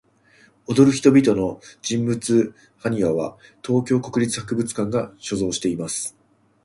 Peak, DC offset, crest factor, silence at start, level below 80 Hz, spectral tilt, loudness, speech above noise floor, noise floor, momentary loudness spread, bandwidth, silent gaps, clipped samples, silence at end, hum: -2 dBFS; under 0.1%; 20 dB; 0.7 s; -54 dBFS; -5.5 dB/octave; -21 LUFS; 35 dB; -55 dBFS; 13 LU; 11.5 kHz; none; under 0.1%; 0.55 s; none